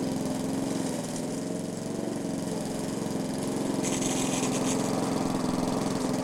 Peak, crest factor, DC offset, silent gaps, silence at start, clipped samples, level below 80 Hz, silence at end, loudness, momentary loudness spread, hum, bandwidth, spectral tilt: -14 dBFS; 16 dB; under 0.1%; none; 0 s; under 0.1%; -54 dBFS; 0 s; -30 LUFS; 5 LU; none; 17 kHz; -4.5 dB/octave